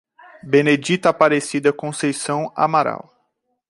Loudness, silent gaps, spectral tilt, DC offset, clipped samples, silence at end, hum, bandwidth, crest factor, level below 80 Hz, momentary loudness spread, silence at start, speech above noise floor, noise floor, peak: -18 LUFS; none; -5 dB/octave; under 0.1%; under 0.1%; 0.7 s; none; 11.5 kHz; 18 dB; -64 dBFS; 8 LU; 0.45 s; 52 dB; -70 dBFS; -2 dBFS